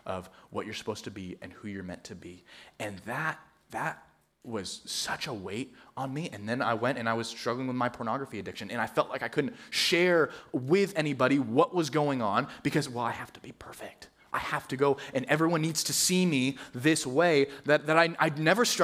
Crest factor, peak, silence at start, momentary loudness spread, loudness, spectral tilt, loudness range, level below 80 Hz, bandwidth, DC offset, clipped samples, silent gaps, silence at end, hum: 22 dB; -8 dBFS; 0.05 s; 17 LU; -29 LUFS; -4 dB/octave; 12 LU; -68 dBFS; 16 kHz; under 0.1%; under 0.1%; none; 0 s; none